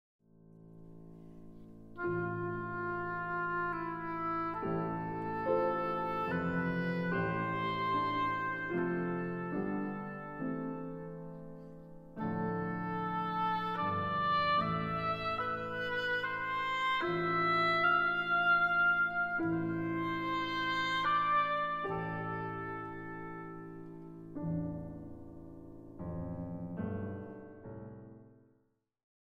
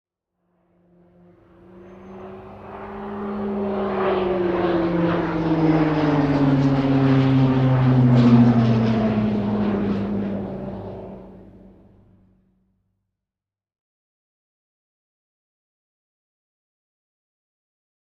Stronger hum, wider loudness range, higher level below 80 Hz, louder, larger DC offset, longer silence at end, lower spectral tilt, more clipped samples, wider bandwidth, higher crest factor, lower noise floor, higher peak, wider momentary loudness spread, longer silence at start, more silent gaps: neither; second, 13 LU vs 17 LU; second, -60 dBFS vs -46 dBFS; second, -34 LUFS vs -19 LUFS; neither; second, 0.95 s vs 6.65 s; second, -7 dB/octave vs -9.5 dB/octave; neither; first, 7.8 kHz vs 6.4 kHz; about the same, 16 dB vs 18 dB; second, -75 dBFS vs under -90 dBFS; second, -20 dBFS vs -4 dBFS; about the same, 20 LU vs 21 LU; second, 0.45 s vs 1.75 s; neither